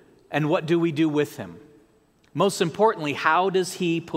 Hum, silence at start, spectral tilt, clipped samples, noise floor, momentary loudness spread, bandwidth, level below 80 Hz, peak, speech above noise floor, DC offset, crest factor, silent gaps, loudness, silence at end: none; 0.3 s; -5.5 dB/octave; under 0.1%; -60 dBFS; 9 LU; 16 kHz; -68 dBFS; -4 dBFS; 37 dB; under 0.1%; 20 dB; none; -23 LUFS; 0 s